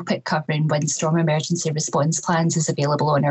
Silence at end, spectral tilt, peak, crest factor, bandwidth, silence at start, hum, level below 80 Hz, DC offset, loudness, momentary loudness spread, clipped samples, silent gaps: 0 s; -5 dB/octave; -8 dBFS; 14 dB; 8.4 kHz; 0 s; none; -64 dBFS; under 0.1%; -21 LUFS; 4 LU; under 0.1%; none